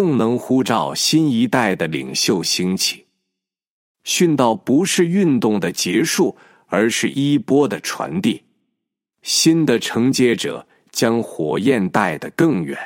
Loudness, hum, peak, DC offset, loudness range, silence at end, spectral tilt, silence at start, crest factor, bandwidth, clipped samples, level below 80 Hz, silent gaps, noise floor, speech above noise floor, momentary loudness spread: -18 LUFS; none; -2 dBFS; under 0.1%; 2 LU; 0 s; -4 dB/octave; 0 s; 16 dB; 16.5 kHz; under 0.1%; -64 dBFS; 3.67-3.95 s; -81 dBFS; 64 dB; 7 LU